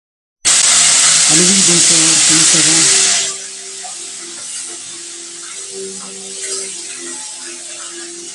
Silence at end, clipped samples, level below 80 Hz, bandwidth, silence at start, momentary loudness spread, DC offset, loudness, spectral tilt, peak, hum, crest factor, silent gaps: 0 s; under 0.1%; -60 dBFS; 16 kHz; 0.45 s; 19 LU; under 0.1%; -8 LUFS; 0 dB/octave; 0 dBFS; none; 14 dB; none